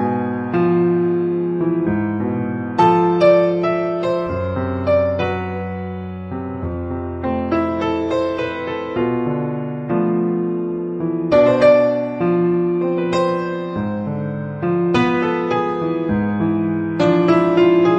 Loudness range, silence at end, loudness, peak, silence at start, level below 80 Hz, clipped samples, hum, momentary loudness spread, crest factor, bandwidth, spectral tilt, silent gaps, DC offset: 5 LU; 0 s; -18 LUFS; -2 dBFS; 0 s; -46 dBFS; under 0.1%; none; 11 LU; 16 dB; 7.8 kHz; -8.5 dB/octave; none; under 0.1%